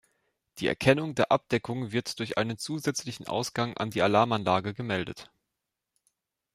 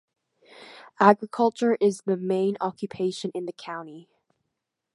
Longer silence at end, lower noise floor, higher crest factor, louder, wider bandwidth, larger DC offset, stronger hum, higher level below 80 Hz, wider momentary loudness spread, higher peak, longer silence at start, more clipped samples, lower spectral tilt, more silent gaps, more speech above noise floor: first, 1.3 s vs 0.9 s; about the same, -85 dBFS vs -82 dBFS; about the same, 22 dB vs 26 dB; second, -28 LUFS vs -24 LUFS; first, 16 kHz vs 11.5 kHz; neither; neither; first, -62 dBFS vs -74 dBFS; second, 8 LU vs 17 LU; second, -6 dBFS vs -2 dBFS; about the same, 0.55 s vs 0.6 s; neither; about the same, -5 dB/octave vs -6 dB/octave; neither; about the same, 57 dB vs 58 dB